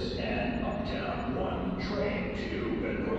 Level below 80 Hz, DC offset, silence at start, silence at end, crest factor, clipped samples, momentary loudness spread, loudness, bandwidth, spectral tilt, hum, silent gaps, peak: -44 dBFS; under 0.1%; 0 s; 0 s; 12 dB; under 0.1%; 2 LU; -33 LUFS; 8 kHz; -7.5 dB/octave; none; none; -20 dBFS